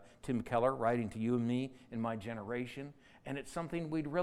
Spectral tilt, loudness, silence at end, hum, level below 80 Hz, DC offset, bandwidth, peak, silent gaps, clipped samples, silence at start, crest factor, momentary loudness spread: -7 dB/octave; -37 LUFS; 0 s; none; -64 dBFS; under 0.1%; 12.5 kHz; -18 dBFS; none; under 0.1%; 0 s; 18 dB; 12 LU